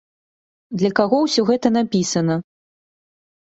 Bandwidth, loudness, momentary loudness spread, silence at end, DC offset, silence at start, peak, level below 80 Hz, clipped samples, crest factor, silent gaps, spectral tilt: 8.2 kHz; -19 LUFS; 6 LU; 1 s; under 0.1%; 0.7 s; -2 dBFS; -60 dBFS; under 0.1%; 18 dB; none; -5 dB/octave